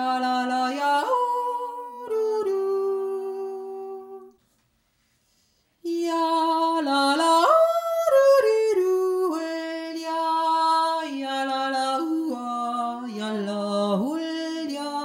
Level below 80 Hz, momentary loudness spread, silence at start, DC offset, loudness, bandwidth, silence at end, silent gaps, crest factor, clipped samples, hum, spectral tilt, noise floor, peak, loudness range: -78 dBFS; 12 LU; 0 s; under 0.1%; -24 LUFS; 16.5 kHz; 0 s; none; 18 dB; under 0.1%; none; -4 dB/octave; -68 dBFS; -6 dBFS; 10 LU